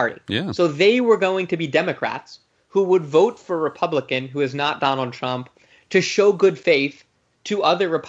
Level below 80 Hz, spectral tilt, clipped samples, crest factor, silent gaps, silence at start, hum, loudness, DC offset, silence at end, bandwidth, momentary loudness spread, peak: -66 dBFS; -5 dB/octave; under 0.1%; 16 dB; none; 0 s; none; -20 LUFS; under 0.1%; 0 s; 8 kHz; 10 LU; -4 dBFS